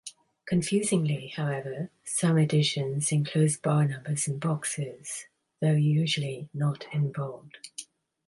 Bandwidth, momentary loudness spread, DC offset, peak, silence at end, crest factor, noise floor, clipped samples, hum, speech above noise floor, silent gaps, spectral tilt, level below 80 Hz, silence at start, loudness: 11.5 kHz; 14 LU; under 0.1%; -14 dBFS; 0.45 s; 14 dB; -47 dBFS; under 0.1%; none; 20 dB; none; -5 dB/octave; -68 dBFS; 0.05 s; -28 LUFS